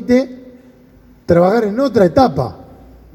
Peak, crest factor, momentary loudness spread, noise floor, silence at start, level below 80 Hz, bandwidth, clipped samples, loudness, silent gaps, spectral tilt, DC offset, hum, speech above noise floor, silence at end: 0 dBFS; 16 dB; 12 LU; -45 dBFS; 0 s; -42 dBFS; 16.5 kHz; under 0.1%; -14 LUFS; none; -7.5 dB/octave; under 0.1%; none; 33 dB; 0.55 s